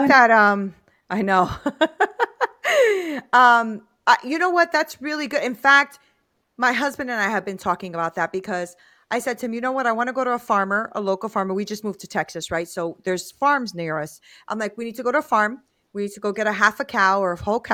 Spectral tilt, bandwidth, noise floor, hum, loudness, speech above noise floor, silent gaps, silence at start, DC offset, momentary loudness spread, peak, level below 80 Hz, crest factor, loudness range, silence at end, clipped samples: -4 dB/octave; 17.5 kHz; -68 dBFS; none; -21 LUFS; 47 dB; none; 0 s; under 0.1%; 13 LU; 0 dBFS; -58 dBFS; 20 dB; 6 LU; 0 s; under 0.1%